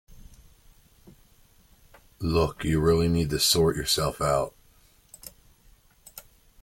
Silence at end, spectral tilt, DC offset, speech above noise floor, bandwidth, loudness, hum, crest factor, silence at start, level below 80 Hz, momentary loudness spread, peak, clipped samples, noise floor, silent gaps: 0.4 s; -4.5 dB/octave; under 0.1%; 35 dB; 17 kHz; -24 LUFS; none; 20 dB; 0.1 s; -44 dBFS; 24 LU; -10 dBFS; under 0.1%; -59 dBFS; none